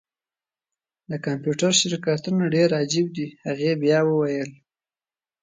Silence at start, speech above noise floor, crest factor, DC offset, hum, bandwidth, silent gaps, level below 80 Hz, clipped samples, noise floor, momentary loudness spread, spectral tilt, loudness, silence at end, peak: 1.1 s; over 68 dB; 20 dB; under 0.1%; none; 9.6 kHz; none; -68 dBFS; under 0.1%; under -90 dBFS; 11 LU; -4.5 dB/octave; -22 LUFS; 0.9 s; -4 dBFS